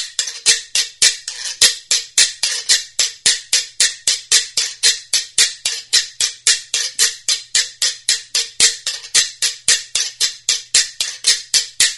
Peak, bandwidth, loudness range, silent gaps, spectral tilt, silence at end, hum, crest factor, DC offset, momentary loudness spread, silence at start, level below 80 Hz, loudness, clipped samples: 0 dBFS; over 20 kHz; 1 LU; none; 4 dB/octave; 0 s; none; 18 dB; under 0.1%; 6 LU; 0 s; -58 dBFS; -15 LUFS; under 0.1%